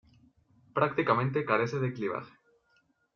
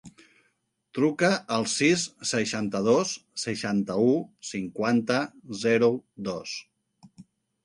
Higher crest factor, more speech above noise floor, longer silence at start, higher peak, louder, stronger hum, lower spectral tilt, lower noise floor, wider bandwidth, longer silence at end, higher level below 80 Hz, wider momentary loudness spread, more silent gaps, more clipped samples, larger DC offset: about the same, 22 dB vs 18 dB; second, 42 dB vs 47 dB; first, 0.75 s vs 0.05 s; about the same, -10 dBFS vs -8 dBFS; second, -30 LUFS vs -26 LUFS; neither; about the same, -5.5 dB/octave vs -4.5 dB/octave; about the same, -71 dBFS vs -73 dBFS; second, 7 kHz vs 11.5 kHz; first, 0.85 s vs 0.4 s; about the same, -68 dBFS vs -66 dBFS; second, 9 LU vs 12 LU; neither; neither; neither